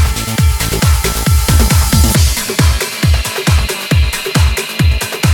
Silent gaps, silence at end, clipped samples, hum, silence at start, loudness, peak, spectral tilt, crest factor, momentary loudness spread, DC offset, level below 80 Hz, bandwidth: none; 0 s; under 0.1%; none; 0 s; -12 LUFS; 0 dBFS; -4 dB/octave; 12 dB; 4 LU; under 0.1%; -16 dBFS; 19.5 kHz